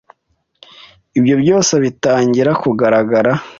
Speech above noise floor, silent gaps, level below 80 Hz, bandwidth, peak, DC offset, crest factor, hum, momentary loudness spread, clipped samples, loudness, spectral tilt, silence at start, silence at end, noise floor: 52 dB; none; -54 dBFS; 7.6 kHz; -2 dBFS; under 0.1%; 12 dB; none; 3 LU; under 0.1%; -13 LUFS; -5 dB/octave; 1.15 s; 0.05 s; -65 dBFS